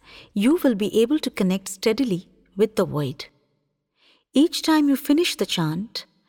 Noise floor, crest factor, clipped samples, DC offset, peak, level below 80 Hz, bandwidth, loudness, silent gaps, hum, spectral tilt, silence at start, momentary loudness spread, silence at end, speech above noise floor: -72 dBFS; 14 dB; under 0.1%; under 0.1%; -8 dBFS; -60 dBFS; 18 kHz; -22 LUFS; none; none; -5 dB/octave; 0.15 s; 11 LU; 0.25 s; 51 dB